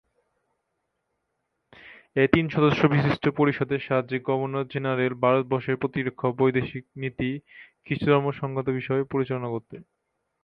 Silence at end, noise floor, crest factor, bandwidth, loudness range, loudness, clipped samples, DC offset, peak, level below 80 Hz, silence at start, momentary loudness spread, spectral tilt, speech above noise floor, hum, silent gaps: 0.6 s; -78 dBFS; 24 dB; 6.2 kHz; 4 LU; -25 LUFS; under 0.1%; under 0.1%; -2 dBFS; -56 dBFS; 1.85 s; 9 LU; -9 dB/octave; 54 dB; none; none